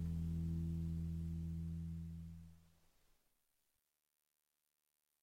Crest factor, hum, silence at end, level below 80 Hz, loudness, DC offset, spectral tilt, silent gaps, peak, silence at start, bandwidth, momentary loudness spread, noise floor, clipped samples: 14 dB; none; 2.6 s; -54 dBFS; -45 LUFS; under 0.1%; -9 dB/octave; none; -34 dBFS; 0 s; 12.5 kHz; 13 LU; -89 dBFS; under 0.1%